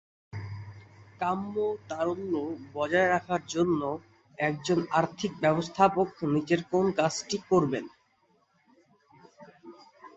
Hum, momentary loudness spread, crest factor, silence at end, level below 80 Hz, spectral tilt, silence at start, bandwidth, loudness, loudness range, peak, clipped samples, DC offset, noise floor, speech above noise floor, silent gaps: none; 15 LU; 22 dB; 0.1 s; -62 dBFS; -5.5 dB/octave; 0.35 s; 8.2 kHz; -28 LUFS; 4 LU; -8 dBFS; under 0.1%; under 0.1%; -69 dBFS; 41 dB; none